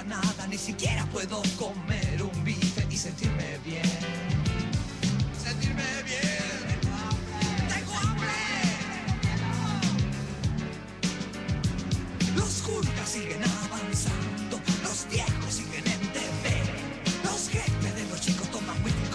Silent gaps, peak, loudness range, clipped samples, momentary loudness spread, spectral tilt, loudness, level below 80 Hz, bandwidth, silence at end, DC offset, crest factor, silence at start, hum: none; -14 dBFS; 1 LU; under 0.1%; 4 LU; -4.5 dB/octave; -29 LUFS; -42 dBFS; 11 kHz; 0 s; under 0.1%; 16 dB; 0 s; none